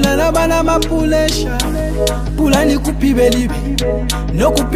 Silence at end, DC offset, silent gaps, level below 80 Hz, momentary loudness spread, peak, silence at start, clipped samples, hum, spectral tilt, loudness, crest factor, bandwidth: 0 s; under 0.1%; none; -20 dBFS; 5 LU; 0 dBFS; 0 s; under 0.1%; none; -5 dB/octave; -15 LUFS; 14 dB; 15.5 kHz